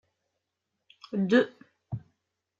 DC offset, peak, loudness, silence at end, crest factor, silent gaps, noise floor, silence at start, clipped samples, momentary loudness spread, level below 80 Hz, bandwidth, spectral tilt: under 0.1%; -10 dBFS; -27 LUFS; 0.6 s; 22 dB; none; -83 dBFS; 1.1 s; under 0.1%; 17 LU; -68 dBFS; 7.6 kHz; -7 dB/octave